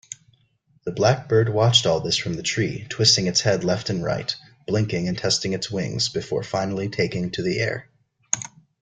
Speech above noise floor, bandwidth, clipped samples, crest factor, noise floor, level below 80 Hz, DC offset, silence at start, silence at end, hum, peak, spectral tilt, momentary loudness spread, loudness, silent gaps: 41 dB; 9.6 kHz; under 0.1%; 22 dB; -63 dBFS; -54 dBFS; under 0.1%; 0.1 s; 0.35 s; none; -2 dBFS; -4 dB/octave; 10 LU; -22 LUFS; none